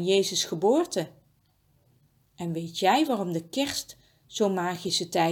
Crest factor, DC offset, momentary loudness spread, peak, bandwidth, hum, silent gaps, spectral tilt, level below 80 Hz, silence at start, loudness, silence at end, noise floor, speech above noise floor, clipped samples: 18 dB; under 0.1%; 11 LU; -10 dBFS; 18.5 kHz; none; none; -4 dB/octave; -68 dBFS; 0 s; -27 LUFS; 0 s; -66 dBFS; 40 dB; under 0.1%